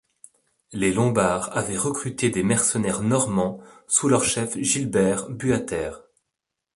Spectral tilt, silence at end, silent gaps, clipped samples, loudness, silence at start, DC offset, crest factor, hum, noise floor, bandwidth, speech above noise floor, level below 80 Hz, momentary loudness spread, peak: -4.5 dB/octave; 0.75 s; none; under 0.1%; -22 LUFS; 0.7 s; under 0.1%; 18 dB; none; -83 dBFS; 11.5 kHz; 60 dB; -52 dBFS; 8 LU; -6 dBFS